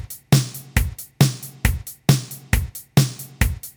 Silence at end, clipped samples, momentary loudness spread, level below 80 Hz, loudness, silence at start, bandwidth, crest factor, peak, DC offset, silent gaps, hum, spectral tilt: 0.05 s; under 0.1%; 5 LU; -30 dBFS; -22 LUFS; 0 s; over 20 kHz; 20 dB; -2 dBFS; under 0.1%; none; none; -5 dB/octave